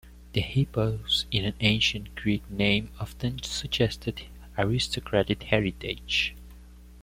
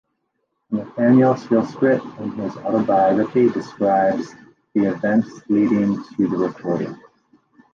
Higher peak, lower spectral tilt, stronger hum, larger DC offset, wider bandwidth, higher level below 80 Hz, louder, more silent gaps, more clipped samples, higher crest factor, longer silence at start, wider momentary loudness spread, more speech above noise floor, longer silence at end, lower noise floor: about the same, -6 dBFS vs -4 dBFS; second, -5 dB/octave vs -8.5 dB/octave; first, 60 Hz at -45 dBFS vs none; neither; first, 16 kHz vs 7.2 kHz; first, -44 dBFS vs -62 dBFS; second, -27 LUFS vs -19 LUFS; neither; neither; first, 22 dB vs 16 dB; second, 0.05 s vs 0.7 s; second, 8 LU vs 11 LU; second, 20 dB vs 54 dB; second, 0 s vs 0.8 s; second, -48 dBFS vs -73 dBFS